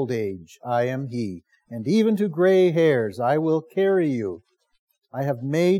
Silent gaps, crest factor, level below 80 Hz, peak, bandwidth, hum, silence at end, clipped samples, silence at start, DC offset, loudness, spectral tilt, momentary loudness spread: 4.79-4.87 s; 14 dB; -76 dBFS; -8 dBFS; 14 kHz; none; 0 s; under 0.1%; 0 s; under 0.1%; -22 LUFS; -7.5 dB/octave; 15 LU